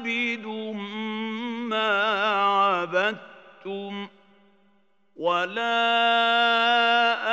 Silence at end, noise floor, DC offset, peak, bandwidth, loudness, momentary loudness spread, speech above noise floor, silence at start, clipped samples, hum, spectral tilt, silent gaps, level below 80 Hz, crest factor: 0 s; -66 dBFS; under 0.1%; -8 dBFS; 8 kHz; -23 LUFS; 15 LU; 43 dB; 0 s; under 0.1%; none; -4 dB/octave; none; -90 dBFS; 16 dB